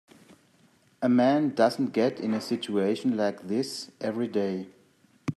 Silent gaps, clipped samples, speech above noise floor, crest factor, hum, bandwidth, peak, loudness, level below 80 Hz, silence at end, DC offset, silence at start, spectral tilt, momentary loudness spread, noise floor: none; under 0.1%; 36 dB; 20 dB; none; 13 kHz; -8 dBFS; -27 LUFS; -76 dBFS; 0.05 s; under 0.1%; 1 s; -6 dB/octave; 11 LU; -62 dBFS